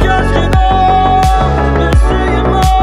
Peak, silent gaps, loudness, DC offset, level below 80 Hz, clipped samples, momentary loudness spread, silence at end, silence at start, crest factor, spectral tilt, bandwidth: 0 dBFS; none; -10 LUFS; under 0.1%; -14 dBFS; under 0.1%; 3 LU; 0 s; 0 s; 8 dB; -6.5 dB/octave; 13.5 kHz